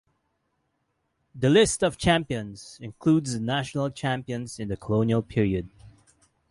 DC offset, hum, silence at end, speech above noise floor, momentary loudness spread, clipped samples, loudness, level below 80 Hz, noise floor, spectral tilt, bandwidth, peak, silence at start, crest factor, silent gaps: under 0.1%; none; 0.6 s; 50 dB; 14 LU; under 0.1%; -25 LUFS; -50 dBFS; -75 dBFS; -5.5 dB/octave; 11.5 kHz; -6 dBFS; 1.35 s; 20 dB; none